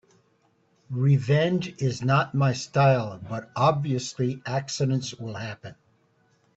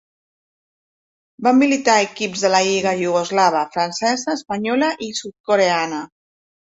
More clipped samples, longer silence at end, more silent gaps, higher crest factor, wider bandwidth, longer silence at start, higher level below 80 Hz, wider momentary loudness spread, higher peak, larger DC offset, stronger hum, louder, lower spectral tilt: neither; first, 0.85 s vs 0.6 s; second, none vs 5.40-5.44 s; about the same, 18 dB vs 18 dB; about the same, 8 kHz vs 8 kHz; second, 0.9 s vs 1.4 s; about the same, -62 dBFS vs -64 dBFS; first, 14 LU vs 10 LU; second, -8 dBFS vs -2 dBFS; neither; neither; second, -25 LUFS vs -18 LUFS; first, -6 dB/octave vs -3.5 dB/octave